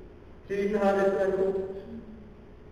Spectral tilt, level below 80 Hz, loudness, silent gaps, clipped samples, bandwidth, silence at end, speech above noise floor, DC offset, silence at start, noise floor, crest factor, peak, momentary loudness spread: -7 dB/octave; -52 dBFS; -27 LUFS; none; under 0.1%; 10.5 kHz; 0 s; 21 dB; under 0.1%; 0 s; -48 dBFS; 16 dB; -12 dBFS; 20 LU